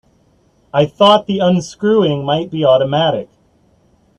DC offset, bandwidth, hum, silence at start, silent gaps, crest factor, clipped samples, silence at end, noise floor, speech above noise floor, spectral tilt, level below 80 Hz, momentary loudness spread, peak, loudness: under 0.1%; 10.5 kHz; none; 0.75 s; none; 16 dB; under 0.1%; 0.95 s; -55 dBFS; 41 dB; -6 dB/octave; -54 dBFS; 7 LU; 0 dBFS; -14 LUFS